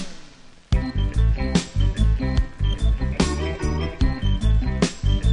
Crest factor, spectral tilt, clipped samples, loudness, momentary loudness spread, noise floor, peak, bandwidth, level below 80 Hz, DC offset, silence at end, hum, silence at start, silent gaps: 16 dB; -6 dB/octave; under 0.1%; -23 LUFS; 4 LU; -44 dBFS; -4 dBFS; 10.5 kHz; -22 dBFS; under 0.1%; 0 s; none; 0 s; none